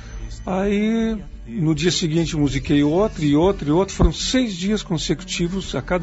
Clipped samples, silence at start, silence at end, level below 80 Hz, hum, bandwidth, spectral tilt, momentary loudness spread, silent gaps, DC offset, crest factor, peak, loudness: under 0.1%; 0 s; 0 s; -32 dBFS; none; 8 kHz; -5.5 dB/octave; 8 LU; none; under 0.1%; 18 dB; -2 dBFS; -20 LUFS